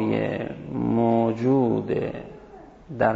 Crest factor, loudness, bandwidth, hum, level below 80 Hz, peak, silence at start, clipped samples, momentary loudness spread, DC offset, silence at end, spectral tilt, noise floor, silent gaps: 18 dB; -24 LUFS; 7.4 kHz; none; -52 dBFS; -6 dBFS; 0 s; under 0.1%; 18 LU; under 0.1%; 0 s; -9.5 dB/octave; -46 dBFS; none